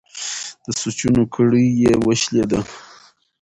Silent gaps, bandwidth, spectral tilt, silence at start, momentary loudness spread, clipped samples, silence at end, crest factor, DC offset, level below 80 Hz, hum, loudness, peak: none; 11 kHz; -5 dB/octave; 0.15 s; 11 LU; under 0.1%; 0.6 s; 14 dB; under 0.1%; -46 dBFS; none; -18 LUFS; -4 dBFS